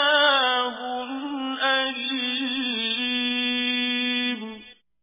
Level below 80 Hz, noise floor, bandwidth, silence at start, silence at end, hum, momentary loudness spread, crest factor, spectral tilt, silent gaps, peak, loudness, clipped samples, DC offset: -68 dBFS; -46 dBFS; 3.9 kHz; 0 s; 0.3 s; none; 12 LU; 16 dB; 2 dB/octave; none; -10 dBFS; -23 LUFS; under 0.1%; under 0.1%